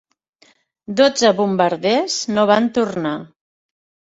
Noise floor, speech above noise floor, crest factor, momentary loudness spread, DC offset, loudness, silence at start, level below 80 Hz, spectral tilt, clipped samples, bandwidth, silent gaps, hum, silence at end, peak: -56 dBFS; 40 dB; 18 dB; 10 LU; under 0.1%; -17 LUFS; 0.9 s; -62 dBFS; -4 dB/octave; under 0.1%; 8.2 kHz; none; none; 0.85 s; 0 dBFS